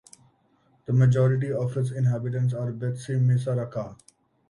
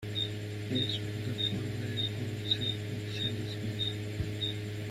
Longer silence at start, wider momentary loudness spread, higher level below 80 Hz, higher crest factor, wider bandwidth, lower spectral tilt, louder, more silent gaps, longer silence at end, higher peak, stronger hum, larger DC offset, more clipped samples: first, 0.9 s vs 0 s; first, 12 LU vs 6 LU; about the same, -60 dBFS vs -56 dBFS; about the same, 14 dB vs 16 dB; second, 11 kHz vs 14.5 kHz; first, -8.5 dB/octave vs -5.5 dB/octave; first, -25 LUFS vs -34 LUFS; neither; first, 0.55 s vs 0 s; first, -10 dBFS vs -18 dBFS; neither; neither; neither